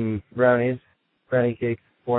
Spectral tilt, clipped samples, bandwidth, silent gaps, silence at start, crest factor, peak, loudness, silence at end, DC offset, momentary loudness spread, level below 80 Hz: -12 dB/octave; under 0.1%; 4 kHz; none; 0 s; 18 dB; -6 dBFS; -23 LUFS; 0 s; under 0.1%; 11 LU; -60 dBFS